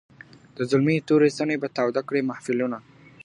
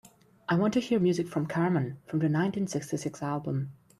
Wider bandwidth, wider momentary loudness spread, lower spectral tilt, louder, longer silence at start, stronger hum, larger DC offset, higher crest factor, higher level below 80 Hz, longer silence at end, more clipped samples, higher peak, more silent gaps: second, 11 kHz vs 13 kHz; first, 11 LU vs 7 LU; about the same, -6.5 dB/octave vs -7 dB/octave; first, -24 LUFS vs -29 LUFS; about the same, 0.6 s vs 0.5 s; neither; neither; about the same, 16 dB vs 14 dB; about the same, -68 dBFS vs -66 dBFS; first, 0.45 s vs 0.25 s; neither; first, -8 dBFS vs -14 dBFS; neither